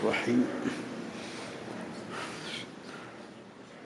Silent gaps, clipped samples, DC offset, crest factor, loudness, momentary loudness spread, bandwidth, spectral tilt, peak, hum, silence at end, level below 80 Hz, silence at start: none; under 0.1%; under 0.1%; 20 dB; -35 LUFS; 18 LU; 12 kHz; -5 dB/octave; -16 dBFS; none; 0 s; -74 dBFS; 0 s